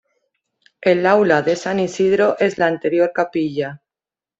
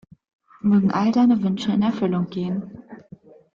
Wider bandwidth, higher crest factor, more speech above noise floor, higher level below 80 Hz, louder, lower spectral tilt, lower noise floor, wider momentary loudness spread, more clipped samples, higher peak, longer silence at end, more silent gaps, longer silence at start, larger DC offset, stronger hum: first, 8 kHz vs 7.2 kHz; first, 18 dB vs 12 dB; first, 73 dB vs 27 dB; about the same, -60 dBFS vs -60 dBFS; first, -17 LUFS vs -21 LUFS; second, -6 dB/octave vs -8 dB/octave; first, -90 dBFS vs -47 dBFS; second, 7 LU vs 11 LU; neither; first, -2 dBFS vs -8 dBFS; about the same, 0.65 s vs 0.6 s; neither; first, 0.8 s vs 0.65 s; neither; neither